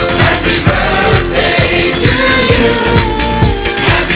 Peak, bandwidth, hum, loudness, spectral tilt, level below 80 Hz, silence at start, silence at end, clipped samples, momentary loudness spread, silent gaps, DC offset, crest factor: 0 dBFS; 4 kHz; none; -10 LUFS; -9.5 dB/octave; -20 dBFS; 0 s; 0 s; 0.5%; 3 LU; none; under 0.1%; 10 dB